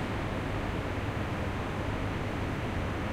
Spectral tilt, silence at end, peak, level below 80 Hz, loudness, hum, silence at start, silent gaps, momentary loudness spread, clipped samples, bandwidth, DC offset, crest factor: -6.5 dB/octave; 0 s; -20 dBFS; -40 dBFS; -34 LUFS; none; 0 s; none; 0 LU; under 0.1%; 15.5 kHz; under 0.1%; 12 dB